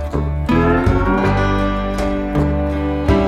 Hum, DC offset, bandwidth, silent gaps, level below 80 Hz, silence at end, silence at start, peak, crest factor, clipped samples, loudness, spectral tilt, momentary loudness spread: none; under 0.1%; 11.5 kHz; none; -22 dBFS; 0 s; 0 s; -2 dBFS; 14 dB; under 0.1%; -17 LUFS; -8 dB/octave; 5 LU